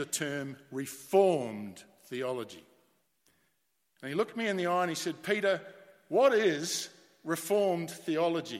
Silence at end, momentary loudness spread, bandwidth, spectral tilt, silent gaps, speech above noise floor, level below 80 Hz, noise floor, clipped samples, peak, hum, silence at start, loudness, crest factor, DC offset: 0 s; 15 LU; 16.5 kHz; -4 dB/octave; none; 47 dB; -82 dBFS; -78 dBFS; under 0.1%; -12 dBFS; none; 0 s; -31 LUFS; 20 dB; under 0.1%